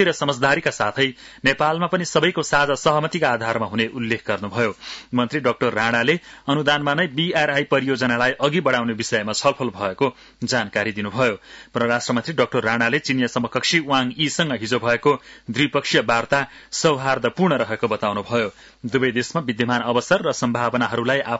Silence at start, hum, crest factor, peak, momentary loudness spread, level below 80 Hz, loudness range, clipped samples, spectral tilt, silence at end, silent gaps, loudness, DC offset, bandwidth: 0 s; none; 16 dB; -4 dBFS; 5 LU; -56 dBFS; 2 LU; under 0.1%; -4.5 dB/octave; 0 s; none; -20 LUFS; under 0.1%; 8 kHz